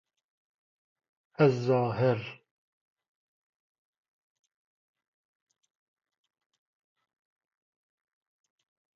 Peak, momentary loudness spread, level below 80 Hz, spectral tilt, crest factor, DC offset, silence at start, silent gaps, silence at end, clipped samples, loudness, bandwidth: -10 dBFS; 9 LU; -74 dBFS; -7 dB/octave; 26 dB; under 0.1%; 1.4 s; none; 6.6 s; under 0.1%; -27 LUFS; 7.2 kHz